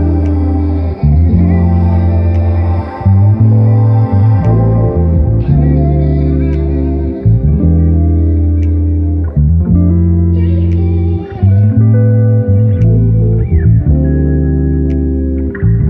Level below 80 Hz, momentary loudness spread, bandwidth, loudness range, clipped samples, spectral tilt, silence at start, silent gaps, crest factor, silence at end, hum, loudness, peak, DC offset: -16 dBFS; 5 LU; 2.9 kHz; 2 LU; under 0.1%; -12.5 dB/octave; 0 s; none; 8 dB; 0 s; none; -11 LUFS; 0 dBFS; under 0.1%